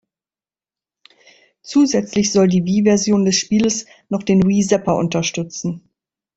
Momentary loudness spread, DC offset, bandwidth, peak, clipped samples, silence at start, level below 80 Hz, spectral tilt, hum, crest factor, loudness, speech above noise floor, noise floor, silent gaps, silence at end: 10 LU; under 0.1%; 8 kHz; -2 dBFS; under 0.1%; 1.65 s; -52 dBFS; -5 dB/octave; none; 16 dB; -17 LUFS; over 74 dB; under -90 dBFS; none; 0.55 s